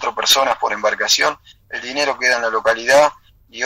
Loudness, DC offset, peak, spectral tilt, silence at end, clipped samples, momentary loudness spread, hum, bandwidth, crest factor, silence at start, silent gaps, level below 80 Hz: -16 LUFS; under 0.1%; -4 dBFS; 0 dB/octave; 0 s; under 0.1%; 11 LU; none; 16 kHz; 14 dB; 0 s; none; -54 dBFS